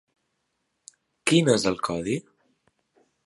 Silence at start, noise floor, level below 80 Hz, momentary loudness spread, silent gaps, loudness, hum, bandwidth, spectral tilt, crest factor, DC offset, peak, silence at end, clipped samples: 1.25 s; -77 dBFS; -60 dBFS; 10 LU; none; -24 LUFS; none; 11.5 kHz; -4.5 dB/octave; 22 dB; under 0.1%; -6 dBFS; 1.05 s; under 0.1%